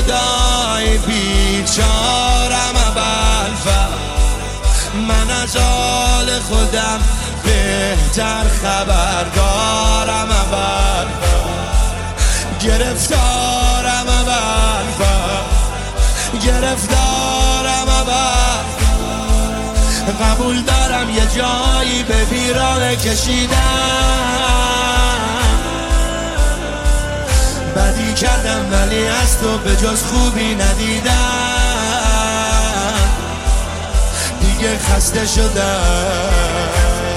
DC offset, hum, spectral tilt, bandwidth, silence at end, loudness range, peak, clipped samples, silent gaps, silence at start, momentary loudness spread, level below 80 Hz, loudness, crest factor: under 0.1%; none; -3.5 dB/octave; 15 kHz; 0 s; 2 LU; -2 dBFS; under 0.1%; none; 0 s; 4 LU; -16 dBFS; -15 LUFS; 12 dB